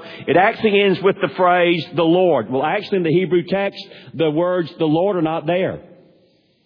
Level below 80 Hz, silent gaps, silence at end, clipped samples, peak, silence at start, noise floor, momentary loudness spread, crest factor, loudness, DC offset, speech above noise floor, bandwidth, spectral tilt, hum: -60 dBFS; none; 0.85 s; under 0.1%; -2 dBFS; 0 s; -57 dBFS; 7 LU; 16 dB; -17 LUFS; under 0.1%; 40 dB; 5.4 kHz; -8.5 dB/octave; none